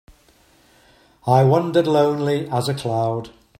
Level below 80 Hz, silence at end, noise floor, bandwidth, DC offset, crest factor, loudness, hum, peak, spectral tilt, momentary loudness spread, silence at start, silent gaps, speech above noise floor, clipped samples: -58 dBFS; 0.3 s; -55 dBFS; 14 kHz; under 0.1%; 20 dB; -19 LUFS; none; -2 dBFS; -7 dB/octave; 9 LU; 1.25 s; none; 37 dB; under 0.1%